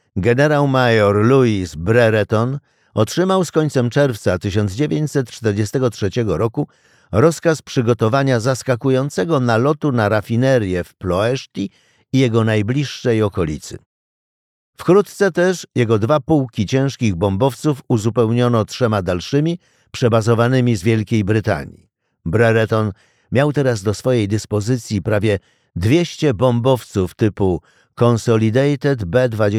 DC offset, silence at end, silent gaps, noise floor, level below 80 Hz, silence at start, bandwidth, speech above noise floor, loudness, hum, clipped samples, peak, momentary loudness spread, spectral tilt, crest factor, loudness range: under 0.1%; 0 s; 13.86-14.73 s; under -90 dBFS; -46 dBFS; 0.15 s; 14.5 kHz; over 74 dB; -17 LUFS; none; under 0.1%; -2 dBFS; 8 LU; -6.5 dB/octave; 14 dB; 2 LU